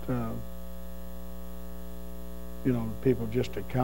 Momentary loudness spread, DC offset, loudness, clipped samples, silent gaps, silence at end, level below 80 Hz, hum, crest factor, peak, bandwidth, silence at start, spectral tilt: 15 LU; 2%; -34 LUFS; under 0.1%; none; 0 s; -44 dBFS; 60 Hz at -45 dBFS; 20 dB; -12 dBFS; 16 kHz; 0 s; -7.5 dB/octave